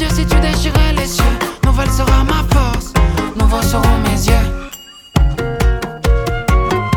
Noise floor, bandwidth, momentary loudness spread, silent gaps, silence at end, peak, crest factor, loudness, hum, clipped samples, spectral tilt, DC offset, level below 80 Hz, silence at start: -34 dBFS; 18 kHz; 4 LU; none; 0 s; 0 dBFS; 12 dB; -15 LUFS; none; under 0.1%; -5.5 dB/octave; under 0.1%; -16 dBFS; 0 s